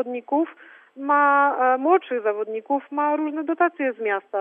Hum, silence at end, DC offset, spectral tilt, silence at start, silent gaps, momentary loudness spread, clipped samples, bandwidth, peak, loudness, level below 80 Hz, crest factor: none; 0 s; under 0.1%; -7 dB/octave; 0 s; none; 8 LU; under 0.1%; 3.7 kHz; -6 dBFS; -22 LUFS; under -90 dBFS; 16 dB